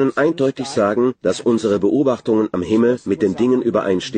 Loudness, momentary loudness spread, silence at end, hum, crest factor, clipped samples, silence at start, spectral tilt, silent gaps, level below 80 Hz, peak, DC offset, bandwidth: -18 LUFS; 3 LU; 0 s; none; 12 dB; under 0.1%; 0 s; -6 dB/octave; none; -54 dBFS; -4 dBFS; under 0.1%; 9.6 kHz